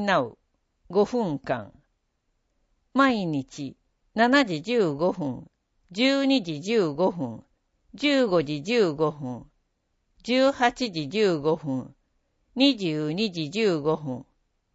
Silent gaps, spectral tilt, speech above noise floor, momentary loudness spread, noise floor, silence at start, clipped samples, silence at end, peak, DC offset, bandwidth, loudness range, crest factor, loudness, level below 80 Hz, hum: none; -5.5 dB/octave; 50 dB; 15 LU; -74 dBFS; 0 s; under 0.1%; 0.5 s; -6 dBFS; under 0.1%; 8 kHz; 3 LU; 20 dB; -25 LUFS; -62 dBFS; none